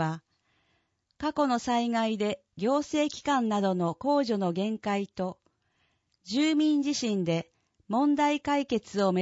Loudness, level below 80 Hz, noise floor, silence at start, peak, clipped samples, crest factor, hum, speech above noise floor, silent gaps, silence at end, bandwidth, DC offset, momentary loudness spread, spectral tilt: -28 LUFS; -66 dBFS; -74 dBFS; 0 s; -14 dBFS; under 0.1%; 16 dB; none; 47 dB; none; 0 s; 8 kHz; under 0.1%; 8 LU; -5.5 dB/octave